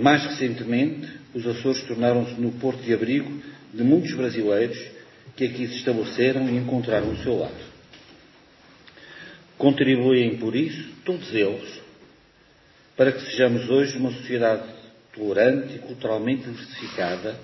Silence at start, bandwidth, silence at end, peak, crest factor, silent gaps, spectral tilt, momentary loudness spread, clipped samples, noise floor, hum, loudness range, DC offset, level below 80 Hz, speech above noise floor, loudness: 0 s; 6.2 kHz; 0 s; -2 dBFS; 22 dB; none; -6.5 dB/octave; 16 LU; under 0.1%; -56 dBFS; none; 3 LU; under 0.1%; -56 dBFS; 33 dB; -24 LUFS